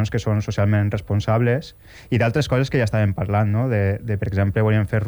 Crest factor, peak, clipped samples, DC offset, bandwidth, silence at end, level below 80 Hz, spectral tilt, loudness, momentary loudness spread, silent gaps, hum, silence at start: 12 dB; -8 dBFS; under 0.1%; under 0.1%; 19.5 kHz; 0 s; -42 dBFS; -7.5 dB/octave; -21 LUFS; 4 LU; none; none; 0 s